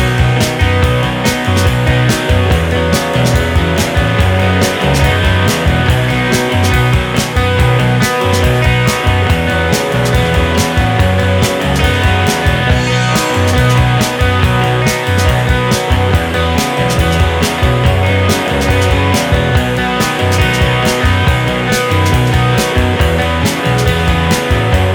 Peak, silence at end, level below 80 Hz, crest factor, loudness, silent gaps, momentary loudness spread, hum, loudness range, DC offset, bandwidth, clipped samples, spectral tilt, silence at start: 0 dBFS; 0 s; -20 dBFS; 12 dB; -12 LUFS; none; 2 LU; none; 1 LU; under 0.1%; 19 kHz; under 0.1%; -5 dB/octave; 0 s